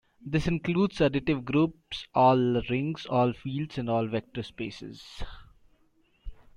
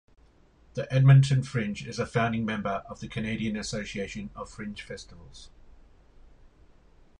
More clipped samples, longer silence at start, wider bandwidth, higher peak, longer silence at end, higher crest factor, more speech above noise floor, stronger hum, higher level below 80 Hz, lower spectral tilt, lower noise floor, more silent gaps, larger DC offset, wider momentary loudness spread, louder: neither; second, 0.25 s vs 0.75 s; about the same, 10.5 kHz vs 9.8 kHz; about the same, -10 dBFS vs -8 dBFS; second, 0.25 s vs 0.7 s; about the same, 18 dB vs 22 dB; first, 39 dB vs 32 dB; neither; about the same, -48 dBFS vs -52 dBFS; about the same, -7.5 dB/octave vs -6.5 dB/octave; first, -66 dBFS vs -59 dBFS; neither; neither; about the same, 19 LU vs 21 LU; about the same, -28 LUFS vs -27 LUFS